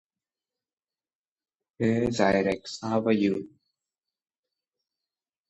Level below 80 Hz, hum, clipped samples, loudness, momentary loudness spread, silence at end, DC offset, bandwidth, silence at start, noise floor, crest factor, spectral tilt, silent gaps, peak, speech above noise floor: -60 dBFS; none; under 0.1%; -26 LUFS; 7 LU; 2 s; under 0.1%; 8.8 kHz; 1.8 s; under -90 dBFS; 22 dB; -6 dB/octave; none; -8 dBFS; over 65 dB